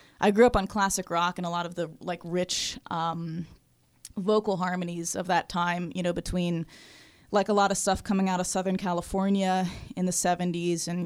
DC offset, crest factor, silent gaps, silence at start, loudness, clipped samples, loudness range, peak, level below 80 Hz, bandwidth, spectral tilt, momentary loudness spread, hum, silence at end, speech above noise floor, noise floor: under 0.1%; 22 dB; none; 0.2 s; -28 LUFS; under 0.1%; 4 LU; -6 dBFS; -48 dBFS; 15.5 kHz; -4.5 dB/octave; 10 LU; none; 0 s; 26 dB; -53 dBFS